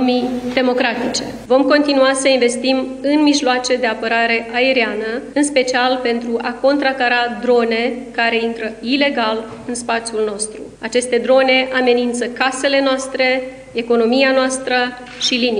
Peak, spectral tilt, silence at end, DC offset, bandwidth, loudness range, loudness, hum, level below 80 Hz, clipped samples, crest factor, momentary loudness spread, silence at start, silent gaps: 0 dBFS; -2.5 dB/octave; 0 s; under 0.1%; 11 kHz; 3 LU; -16 LUFS; 50 Hz at -50 dBFS; -52 dBFS; under 0.1%; 16 dB; 8 LU; 0 s; none